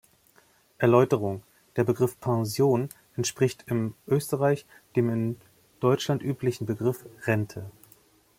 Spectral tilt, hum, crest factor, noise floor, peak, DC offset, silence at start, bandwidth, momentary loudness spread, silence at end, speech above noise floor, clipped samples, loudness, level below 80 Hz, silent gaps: -6.5 dB/octave; none; 22 dB; -62 dBFS; -4 dBFS; under 0.1%; 0.8 s; 16.5 kHz; 11 LU; 0.7 s; 36 dB; under 0.1%; -27 LUFS; -64 dBFS; none